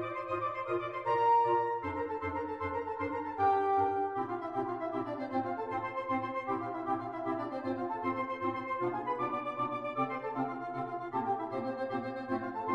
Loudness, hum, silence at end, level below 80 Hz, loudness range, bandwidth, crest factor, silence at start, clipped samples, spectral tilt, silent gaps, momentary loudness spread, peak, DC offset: -34 LUFS; none; 0 s; -68 dBFS; 4 LU; 8.6 kHz; 16 dB; 0 s; under 0.1%; -8 dB/octave; none; 7 LU; -18 dBFS; under 0.1%